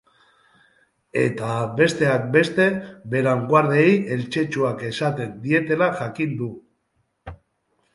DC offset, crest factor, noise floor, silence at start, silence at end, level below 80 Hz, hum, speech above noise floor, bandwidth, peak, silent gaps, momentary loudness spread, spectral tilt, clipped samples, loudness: under 0.1%; 20 dB; -70 dBFS; 1.15 s; 0.6 s; -58 dBFS; none; 50 dB; 11.5 kHz; -2 dBFS; none; 12 LU; -6.5 dB/octave; under 0.1%; -21 LUFS